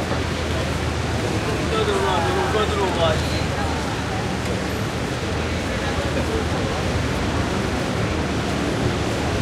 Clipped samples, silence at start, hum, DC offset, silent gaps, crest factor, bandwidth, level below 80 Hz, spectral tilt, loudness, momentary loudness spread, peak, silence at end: under 0.1%; 0 s; none; under 0.1%; none; 16 dB; 15.5 kHz; -32 dBFS; -5 dB/octave; -22 LUFS; 4 LU; -6 dBFS; 0 s